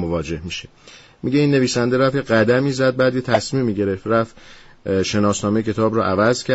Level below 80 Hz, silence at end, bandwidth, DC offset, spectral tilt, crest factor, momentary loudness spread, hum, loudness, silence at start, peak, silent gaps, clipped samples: -46 dBFS; 0 s; 8.2 kHz; under 0.1%; -5.5 dB/octave; 14 dB; 10 LU; none; -19 LUFS; 0 s; -4 dBFS; none; under 0.1%